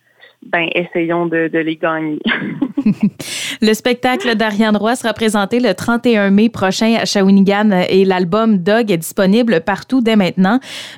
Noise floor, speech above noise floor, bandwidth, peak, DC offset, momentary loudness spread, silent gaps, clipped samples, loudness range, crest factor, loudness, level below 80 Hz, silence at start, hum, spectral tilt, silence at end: -42 dBFS; 28 dB; 16.5 kHz; -2 dBFS; 0.1%; 6 LU; none; under 0.1%; 4 LU; 12 dB; -14 LUFS; -52 dBFS; 0.45 s; none; -5.5 dB/octave; 0 s